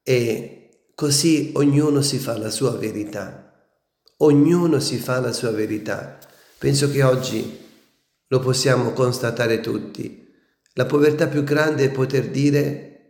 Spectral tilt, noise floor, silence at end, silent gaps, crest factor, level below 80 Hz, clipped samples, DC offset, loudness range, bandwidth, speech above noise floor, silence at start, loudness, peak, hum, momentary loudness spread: -5.5 dB/octave; -66 dBFS; 0.2 s; none; 18 dB; -60 dBFS; under 0.1%; under 0.1%; 2 LU; 18 kHz; 46 dB; 0.05 s; -20 LUFS; -4 dBFS; none; 13 LU